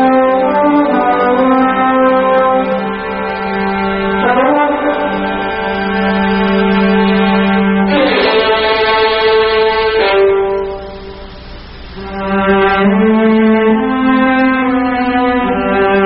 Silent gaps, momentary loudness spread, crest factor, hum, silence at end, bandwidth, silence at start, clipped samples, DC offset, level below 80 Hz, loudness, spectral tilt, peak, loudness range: none; 8 LU; 12 dB; none; 0 s; 5.6 kHz; 0 s; under 0.1%; under 0.1%; -36 dBFS; -11 LUFS; -4 dB/octave; 0 dBFS; 3 LU